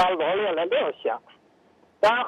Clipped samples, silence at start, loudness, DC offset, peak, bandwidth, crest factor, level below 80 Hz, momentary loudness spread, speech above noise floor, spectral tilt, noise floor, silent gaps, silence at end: under 0.1%; 0 s; -25 LUFS; under 0.1%; -10 dBFS; 11.5 kHz; 14 dB; -66 dBFS; 8 LU; 35 dB; -4 dB/octave; -59 dBFS; none; 0 s